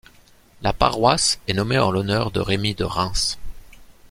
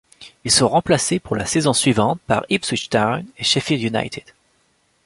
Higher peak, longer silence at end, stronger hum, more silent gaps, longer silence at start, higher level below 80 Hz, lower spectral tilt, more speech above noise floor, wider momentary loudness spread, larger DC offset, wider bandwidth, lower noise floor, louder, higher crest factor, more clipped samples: about the same, -2 dBFS vs -2 dBFS; second, 0.2 s vs 0.85 s; neither; neither; first, 0.6 s vs 0.2 s; first, -36 dBFS vs -48 dBFS; about the same, -4 dB/octave vs -3.5 dB/octave; second, 31 dB vs 44 dB; about the same, 7 LU vs 7 LU; neither; first, 16.5 kHz vs 11.5 kHz; second, -51 dBFS vs -63 dBFS; second, -21 LUFS vs -18 LUFS; about the same, 20 dB vs 18 dB; neither